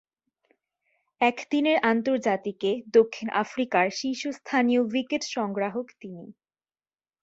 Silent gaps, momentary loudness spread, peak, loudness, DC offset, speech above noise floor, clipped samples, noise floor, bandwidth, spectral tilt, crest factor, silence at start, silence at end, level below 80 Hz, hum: none; 10 LU; -8 dBFS; -25 LUFS; under 0.1%; over 65 dB; under 0.1%; under -90 dBFS; 8 kHz; -4.5 dB/octave; 20 dB; 1.2 s; 0.9 s; -72 dBFS; none